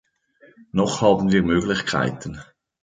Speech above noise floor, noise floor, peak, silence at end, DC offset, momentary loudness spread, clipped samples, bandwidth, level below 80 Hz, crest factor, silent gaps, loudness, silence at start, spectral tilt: 35 dB; -55 dBFS; -4 dBFS; 0.4 s; under 0.1%; 16 LU; under 0.1%; 9.4 kHz; -46 dBFS; 18 dB; none; -20 LUFS; 0.75 s; -5.5 dB/octave